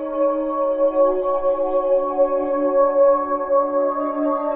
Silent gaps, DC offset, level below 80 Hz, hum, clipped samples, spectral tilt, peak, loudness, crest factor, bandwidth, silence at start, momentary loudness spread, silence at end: none; under 0.1%; -50 dBFS; none; under 0.1%; -5 dB/octave; -6 dBFS; -19 LUFS; 12 dB; 3.2 kHz; 0 s; 5 LU; 0 s